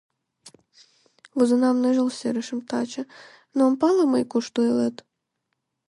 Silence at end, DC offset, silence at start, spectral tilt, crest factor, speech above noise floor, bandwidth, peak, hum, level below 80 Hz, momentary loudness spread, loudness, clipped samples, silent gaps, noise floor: 0.95 s; under 0.1%; 0.45 s; -5 dB/octave; 16 dB; 56 dB; 11 kHz; -8 dBFS; none; -74 dBFS; 12 LU; -23 LUFS; under 0.1%; none; -78 dBFS